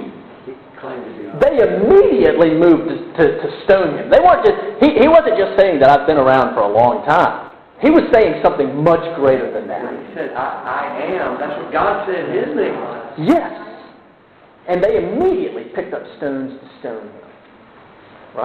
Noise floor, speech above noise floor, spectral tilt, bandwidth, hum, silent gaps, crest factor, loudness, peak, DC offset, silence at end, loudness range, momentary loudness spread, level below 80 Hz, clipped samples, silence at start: -47 dBFS; 33 dB; -8 dB/octave; 7.2 kHz; none; none; 16 dB; -14 LUFS; 0 dBFS; under 0.1%; 0 s; 9 LU; 19 LU; -44 dBFS; under 0.1%; 0 s